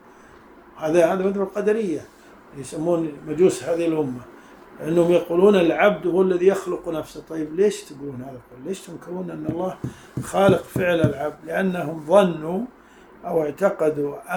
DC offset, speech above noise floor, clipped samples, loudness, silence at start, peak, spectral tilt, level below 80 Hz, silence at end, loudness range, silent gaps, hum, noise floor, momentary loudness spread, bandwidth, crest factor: under 0.1%; 26 dB; under 0.1%; -21 LUFS; 0.75 s; -2 dBFS; -6.5 dB/octave; -56 dBFS; 0 s; 6 LU; none; none; -48 dBFS; 16 LU; 19.5 kHz; 20 dB